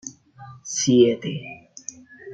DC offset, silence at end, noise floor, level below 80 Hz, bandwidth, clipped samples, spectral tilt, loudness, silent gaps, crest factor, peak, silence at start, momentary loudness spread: under 0.1%; 0 s; -45 dBFS; -66 dBFS; 9.2 kHz; under 0.1%; -4.5 dB/octave; -20 LUFS; none; 20 dB; -4 dBFS; 0.05 s; 22 LU